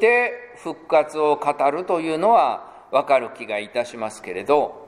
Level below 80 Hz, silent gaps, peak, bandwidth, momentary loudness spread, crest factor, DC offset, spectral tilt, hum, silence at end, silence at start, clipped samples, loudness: -68 dBFS; none; -4 dBFS; 11.5 kHz; 13 LU; 16 dB; under 0.1%; -4.5 dB/octave; none; 0 s; 0 s; under 0.1%; -21 LUFS